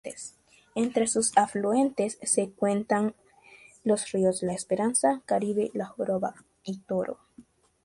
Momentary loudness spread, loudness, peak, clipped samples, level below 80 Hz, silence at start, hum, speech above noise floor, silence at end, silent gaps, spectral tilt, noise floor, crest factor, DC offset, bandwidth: 14 LU; -27 LUFS; -6 dBFS; under 0.1%; -68 dBFS; 0.05 s; none; 29 dB; 0.45 s; none; -4.5 dB/octave; -56 dBFS; 22 dB; under 0.1%; 11.5 kHz